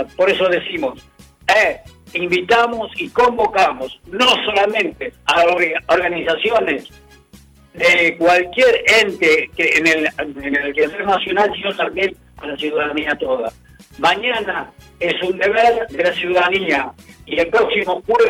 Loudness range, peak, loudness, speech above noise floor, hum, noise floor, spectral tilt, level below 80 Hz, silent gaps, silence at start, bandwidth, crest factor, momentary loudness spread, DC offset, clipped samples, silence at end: 5 LU; -2 dBFS; -16 LUFS; 29 dB; none; -46 dBFS; -3.5 dB/octave; -50 dBFS; none; 0 s; 18 kHz; 14 dB; 11 LU; under 0.1%; under 0.1%; 0 s